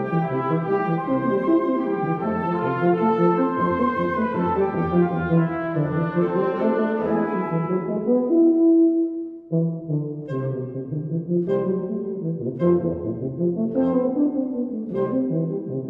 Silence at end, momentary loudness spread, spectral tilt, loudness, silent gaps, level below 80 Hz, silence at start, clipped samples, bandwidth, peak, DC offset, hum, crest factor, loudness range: 0 s; 8 LU; -11 dB/octave; -22 LUFS; none; -56 dBFS; 0 s; under 0.1%; 4.5 kHz; -6 dBFS; under 0.1%; none; 16 dB; 4 LU